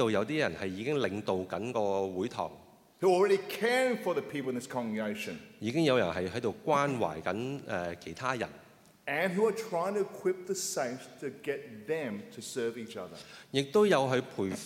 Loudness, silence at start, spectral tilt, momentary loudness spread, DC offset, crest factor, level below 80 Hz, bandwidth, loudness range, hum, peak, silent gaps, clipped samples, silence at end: -32 LUFS; 0 s; -5 dB/octave; 12 LU; under 0.1%; 20 dB; -72 dBFS; 16.5 kHz; 4 LU; none; -12 dBFS; none; under 0.1%; 0 s